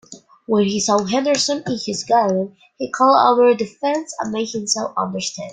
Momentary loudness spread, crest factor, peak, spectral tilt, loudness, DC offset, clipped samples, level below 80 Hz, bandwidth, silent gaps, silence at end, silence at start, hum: 12 LU; 18 dB; -2 dBFS; -3.5 dB/octave; -18 LUFS; under 0.1%; under 0.1%; -62 dBFS; 9.6 kHz; none; 0 s; 0.1 s; none